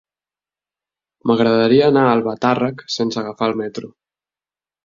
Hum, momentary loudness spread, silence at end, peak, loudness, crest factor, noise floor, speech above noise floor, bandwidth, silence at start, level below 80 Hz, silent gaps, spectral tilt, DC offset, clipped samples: 50 Hz at -50 dBFS; 12 LU; 1 s; -2 dBFS; -17 LUFS; 16 dB; under -90 dBFS; over 74 dB; 7.4 kHz; 1.25 s; -58 dBFS; none; -6 dB/octave; under 0.1%; under 0.1%